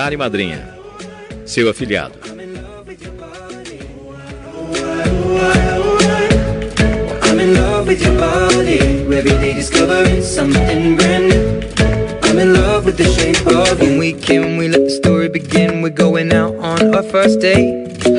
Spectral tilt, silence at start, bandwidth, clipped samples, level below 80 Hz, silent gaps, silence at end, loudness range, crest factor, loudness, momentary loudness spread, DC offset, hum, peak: -5 dB/octave; 0 s; 11.5 kHz; under 0.1%; -26 dBFS; none; 0 s; 10 LU; 14 dB; -13 LUFS; 20 LU; under 0.1%; none; 0 dBFS